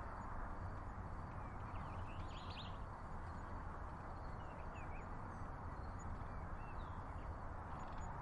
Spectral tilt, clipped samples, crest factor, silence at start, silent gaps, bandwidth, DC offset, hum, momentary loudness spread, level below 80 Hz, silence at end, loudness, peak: -6.5 dB/octave; under 0.1%; 12 dB; 0 s; none; 11 kHz; under 0.1%; none; 2 LU; -52 dBFS; 0 s; -51 LUFS; -36 dBFS